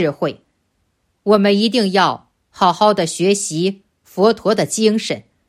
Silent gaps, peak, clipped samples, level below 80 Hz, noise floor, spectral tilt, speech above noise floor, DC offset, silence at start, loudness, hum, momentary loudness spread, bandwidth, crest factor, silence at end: none; 0 dBFS; under 0.1%; -60 dBFS; -66 dBFS; -4.5 dB/octave; 51 dB; under 0.1%; 0 s; -16 LUFS; none; 11 LU; 14.5 kHz; 16 dB; 0.3 s